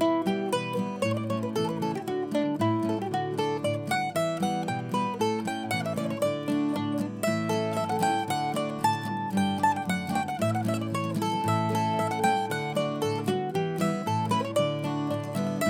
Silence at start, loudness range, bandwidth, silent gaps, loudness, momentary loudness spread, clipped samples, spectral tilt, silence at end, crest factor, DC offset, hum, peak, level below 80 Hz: 0 s; 1 LU; 19 kHz; none; -28 LUFS; 4 LU; under 0.1%; -5.5 dB/octave; 0 s; 16 dB; under 0.1%; none; -12 dBFS; -70 dBFS